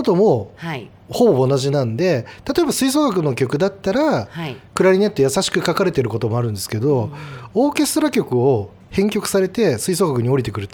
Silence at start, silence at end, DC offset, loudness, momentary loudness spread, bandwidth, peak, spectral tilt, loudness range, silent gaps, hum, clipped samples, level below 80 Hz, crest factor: 0 s; 0.05 s; under 0.1%; -18 LUFS; 9 LU; over 20 kHz; -2 dBFS; -5.5 dB/octave; 1 LU; none; none; under 0.1%; -50 dBFS; 16 dB